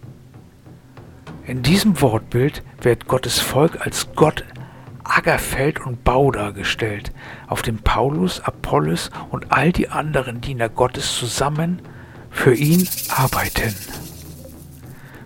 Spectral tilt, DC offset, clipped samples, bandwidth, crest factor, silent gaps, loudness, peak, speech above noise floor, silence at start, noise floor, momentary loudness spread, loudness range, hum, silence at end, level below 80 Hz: -5 dB/octave; under 0.1%; under 0.1%; 18.5 kHz; 20 dB; none; -19 LUFS; 0 dBFS; 25 dB; 0.05 s; -44 dBFS; 20 LU; 2 LU; none; 0 s; -36 dBFS